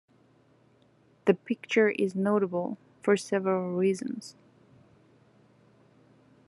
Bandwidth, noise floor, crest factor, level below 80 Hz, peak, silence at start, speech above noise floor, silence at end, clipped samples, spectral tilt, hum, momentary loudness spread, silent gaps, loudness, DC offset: 11.5 kHz; -63 dBFS; 24 dB; -82 dBFS; -8 dBFS; 1.25 s; 36 dB; 2.15 s; under 0.1%; -6 dB/octave; none; 11 LU; none; -28 LUFS; under 0.1%